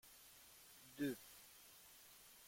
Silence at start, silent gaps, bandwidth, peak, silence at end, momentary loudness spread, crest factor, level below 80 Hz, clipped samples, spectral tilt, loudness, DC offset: 0.05 s; none; 16.5 kHz; -32 dBFS; 0 s; 15 LU; 20 dB; -84 dBFS; under 0.1%; -4 dB/octave; -53 LUFS; under 0.1%